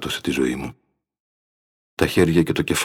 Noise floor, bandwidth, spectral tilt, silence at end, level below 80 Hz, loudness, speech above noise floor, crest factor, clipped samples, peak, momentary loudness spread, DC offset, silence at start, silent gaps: under -90 dBFS; 17.5 kHz; -5 dB/octave; 0 s; -44 dBFS; -21 LUFS; over 70 dB; 18 dB; under 0.1%; -4 dBFS; 15 LU; under 0.1%; 0 s; 1.20-1.97 s